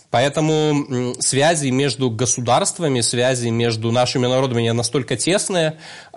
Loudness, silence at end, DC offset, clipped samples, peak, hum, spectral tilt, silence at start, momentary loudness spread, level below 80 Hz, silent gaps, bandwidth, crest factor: -18 LUFS; 0 s; 0.1%; under 0.1%; -6 dBFS; none; -4 dB/octave; 0.1 s; 4 LU; -56 dBFS; none; 11.5 kHz; 14 dB